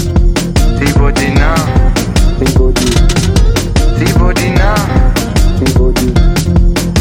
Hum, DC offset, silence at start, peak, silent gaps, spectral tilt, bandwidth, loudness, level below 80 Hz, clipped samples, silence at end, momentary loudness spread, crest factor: none; under 0.1%; 0 s; 0 dBFS; none; -5.5 dB/octave; 16.5 kHz; -11 LUFS; -12 dBFS; under 0.1%; 0 s; 2 LU; 8 dB